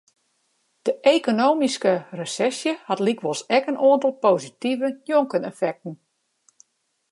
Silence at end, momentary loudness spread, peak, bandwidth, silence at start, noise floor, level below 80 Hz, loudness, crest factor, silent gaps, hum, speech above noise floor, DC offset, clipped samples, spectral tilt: 1.15 s; 9 LU; -4 dBFS; 11.5 kHz; 0.85 s; -72 dBFS; -78 dBFS; -22 LUFS; 20 dB; none; none; 50 dB; under 0.1%; under 0.1%; -4.5 dB/octave